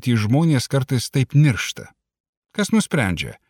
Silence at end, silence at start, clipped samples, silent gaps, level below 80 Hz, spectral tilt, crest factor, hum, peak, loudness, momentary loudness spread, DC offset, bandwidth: 0.15 s; 0 s; under 0.1%; 2.20-2.42 s; -50 dBFS; -5.5 dB/octave; 16 dB; none; -4 dBFS; -19 LUFS; 9 LU; under 0.1%; 17 kHz